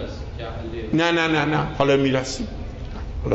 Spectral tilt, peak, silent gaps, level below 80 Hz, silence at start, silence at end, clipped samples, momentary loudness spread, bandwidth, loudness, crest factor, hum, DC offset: -5.5 dB/octave; -4 dBFS; none; -36 dBFS; 0 s; 0 s; under 0.1%; 14 LU; 8.2 kHz; -22 LUFS; 18 dB; none; under 0.1%